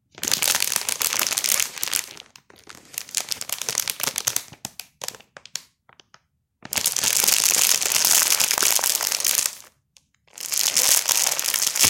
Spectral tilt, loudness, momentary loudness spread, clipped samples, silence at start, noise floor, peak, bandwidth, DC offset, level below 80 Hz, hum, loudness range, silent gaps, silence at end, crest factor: 1.5 dB/octave; -19 LUFS; 18 LU; under 0.1%; 0.2 s; -61 dBFS; 0 dBFS; 17.5 kHz; under 0.1%; -64 dBFS; none; 10 LU; none; 0 s; 24 dB